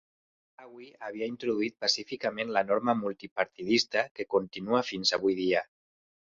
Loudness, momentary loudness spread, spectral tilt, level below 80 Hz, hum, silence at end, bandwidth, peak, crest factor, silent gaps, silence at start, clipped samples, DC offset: -29 LUFS; 10 LU; -3.5 dB/octave; -72 dBFS; none; 0.75 s; 7.8 kHz; -10 dBFS; 22 dB; 3.31-3.36 s, 4.11-4.15 s; 0.6 s; under 0.1%; under 0.1%